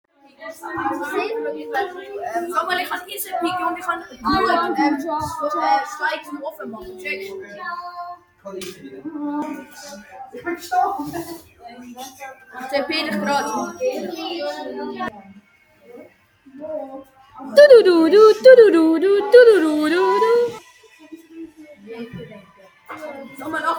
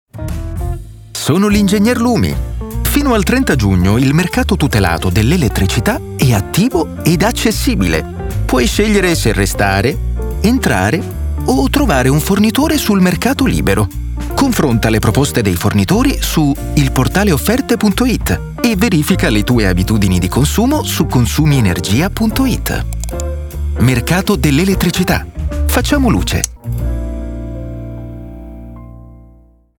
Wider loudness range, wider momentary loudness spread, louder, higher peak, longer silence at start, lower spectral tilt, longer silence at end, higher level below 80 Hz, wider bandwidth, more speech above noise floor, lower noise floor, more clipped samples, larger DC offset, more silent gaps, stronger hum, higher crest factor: first, 18 LU vs 2 LU; first, 26 LU vs 10 LU; second, -17 LUFS vs -13 LUFS; about the same, 0 dBFS vs 0 dBFS; first, 0.4 s vs 0.15 s; second, -4 dB/octave vs -5.5 dB/octave; second, 0 s vs 0.55 s; second, -58 dBFS vs -22 dBFS; about the same, 19.5 kHz vs 19.5 kHz; about the same, 35 dB vs 33 dB; first, -53 dBFS vs -45 dBFS; neither; neither; neither; neither; about the same, 18 dB vs 14 dB